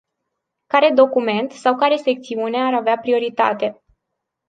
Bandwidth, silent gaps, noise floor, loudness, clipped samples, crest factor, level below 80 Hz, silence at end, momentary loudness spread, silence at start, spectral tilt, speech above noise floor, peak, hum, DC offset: 9.2 kHz; none; -79 dBFS; -18 LUFS; under 0.1%; 18 dB; -68 dBFS; 0.75 s; 8 LU; 0.75 s; -5 dB/octave; 61 dB; -2 dBFS; none; under 0.1%